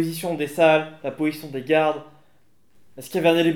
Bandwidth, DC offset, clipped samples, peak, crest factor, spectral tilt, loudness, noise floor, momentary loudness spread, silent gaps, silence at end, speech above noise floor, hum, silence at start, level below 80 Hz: 19 kHz; 0.2%; under 0.1%; -4 dBFS; 18 dB; -5.5 dB/octave; -22 LUFS; -64 dBFS; 14 LU; none; 0 s; 43 dB; none; 0 s; -76 dBFS